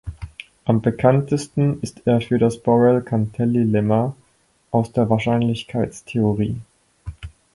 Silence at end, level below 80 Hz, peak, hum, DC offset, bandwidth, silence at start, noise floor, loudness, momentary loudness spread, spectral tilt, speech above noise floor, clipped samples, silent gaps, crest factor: 0.25 s; -46 dBFS; -2 dBFS; none; under 0.1%; 11.5 kHz; 0.05 s; -61 dBFS; -20 LUFS; 18 LU; -8 dB/octave; 42 dB; under 0.1%; none; 18 dB